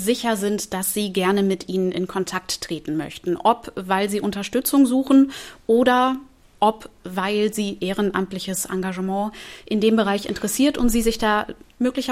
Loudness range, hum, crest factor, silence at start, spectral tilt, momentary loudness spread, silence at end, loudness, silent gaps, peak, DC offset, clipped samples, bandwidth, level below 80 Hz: 4 LU; none; 18 dB; 0 s; -4.5 dB/octave; 9 LU; 0 s; -22 LUFS; none; -4 dBFS; under 0.1%; under 0.1%; 16 kHz; -44 dBFS